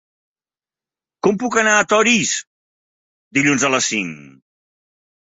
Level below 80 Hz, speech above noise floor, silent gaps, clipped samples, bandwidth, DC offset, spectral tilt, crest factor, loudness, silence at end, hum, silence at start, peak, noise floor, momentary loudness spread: -62 dBFS; over 73 dB; 2.47-3.31 s; under 0.1%; 8.2 kHz; under 0.1%; -2.5 dB/octave; 18 dB; -16 LUFS; 0.95 s; none; 1.25 s; -2 dBFS; under -90 dBFS; 9 LU